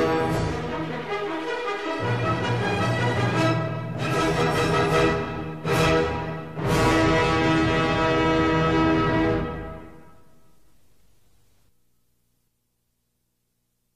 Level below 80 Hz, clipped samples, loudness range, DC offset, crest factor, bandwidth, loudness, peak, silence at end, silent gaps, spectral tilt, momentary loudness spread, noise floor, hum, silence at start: -40 dBFS; under 0.1%; 5 LU; 0.5%; 16 dB; 15 kHz; -23 LUFS; -8 dBFS; 3.95 s; none; -6 dB/octave; 9 LU; -74 dBFS; 60 Hz at -45 dBFS; 0 s